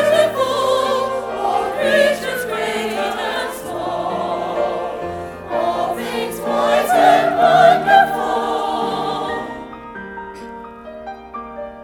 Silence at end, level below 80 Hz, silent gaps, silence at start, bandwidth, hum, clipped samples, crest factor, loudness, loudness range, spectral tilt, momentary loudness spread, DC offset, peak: 0 s; -50 dBFS; none; 0 s; 19.5 kHz; none; under 0.1%; 18 dB; -17 LUFS; 8 LU; -4 dB/octave; 19 LU; under 0.1%; 0 dBFS